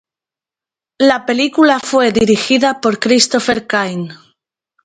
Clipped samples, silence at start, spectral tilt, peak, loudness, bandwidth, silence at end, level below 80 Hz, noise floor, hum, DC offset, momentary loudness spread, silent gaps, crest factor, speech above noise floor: under 0.1%; 1 s; -3.5 dB/octave; 0 dBFS; -13 LUFS; 9.4 kHz; 0.7 s; -50 dBFS; -89 dBFS; none; under 0.1%; 6 LU; none; 14 dB; 76 dB